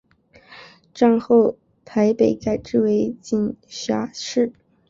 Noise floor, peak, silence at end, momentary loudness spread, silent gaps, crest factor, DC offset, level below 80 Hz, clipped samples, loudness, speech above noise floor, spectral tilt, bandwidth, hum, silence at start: -51 dBFS; -4 dBFS; 0.4 s; 9 LU; none; 16 dB; under 0.1%; -56 dBFS; under 0.1%; -20 LUFS; 32 dB; -6 dB/octave; 7.6 kHz; none; 0.5 s